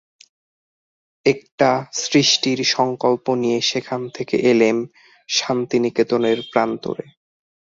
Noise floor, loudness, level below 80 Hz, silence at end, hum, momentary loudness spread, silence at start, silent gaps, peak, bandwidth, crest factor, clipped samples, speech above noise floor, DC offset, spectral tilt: under -90 dBFS; -19 LUFS; -62 dBFS; 0.75 s; none; 10 LU; 1.25 s; 1.52-1.58 s; -2 dBFS; 7.8 kHz; 18 dB; under 0.1%; over 71 dB; under 0.1%; -3.5 dB/octave